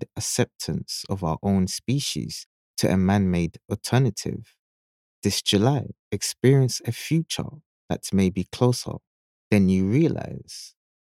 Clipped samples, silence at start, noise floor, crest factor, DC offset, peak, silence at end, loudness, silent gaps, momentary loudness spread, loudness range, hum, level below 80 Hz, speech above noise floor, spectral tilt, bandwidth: under 0.1%; 0 s; under -90 dBFS; 20 dB; under 0.1%; -4 dBFS; 0.4 s; -24 LUFS; 2.46-2.74 s, 4.59-5.22 s, 5.99-6.11 s, 7.66-7.88 s, 9.07-9.51 s; 15 LU; 2 LU; none; -52 dBFS; over 67 dB; -5.5 dB/octave; 15.5 kHz